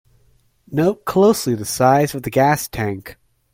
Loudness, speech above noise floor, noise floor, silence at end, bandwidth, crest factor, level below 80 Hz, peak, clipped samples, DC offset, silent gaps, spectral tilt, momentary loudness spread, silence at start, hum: -18 LUFS; 40 dB; -57 dBFS; 0.4 s; 16.5 kHz; 18 dB; -48 dBFS; -2 dBFS; under 0.1%; under 0.1%; none; -5.5 dB/octave; 10 LU; 0.7 s; none